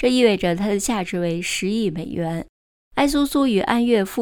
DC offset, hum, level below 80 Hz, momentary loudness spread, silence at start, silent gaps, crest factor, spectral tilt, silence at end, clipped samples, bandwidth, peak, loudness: under 0.1%; none; -44 dBFS; 9 LU; 0 s; 2.49-2.91 s; 18 dB; -5 dB/octave; 0 s; under 0.1%; 19.5 kHz; -4 dBFS; -21 LUFS